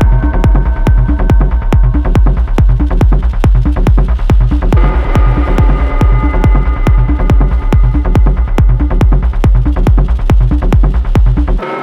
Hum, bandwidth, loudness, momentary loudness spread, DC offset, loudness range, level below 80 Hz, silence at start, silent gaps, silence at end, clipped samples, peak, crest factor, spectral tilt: none; 5.8 kHz; -11 LUFS; 1 LU; under 0.1%; 0 LU; -8 dBFS; 0 s; none; 0 s; under 0.1%; 0 dBFS; 8 dB; -8.5 dB/octave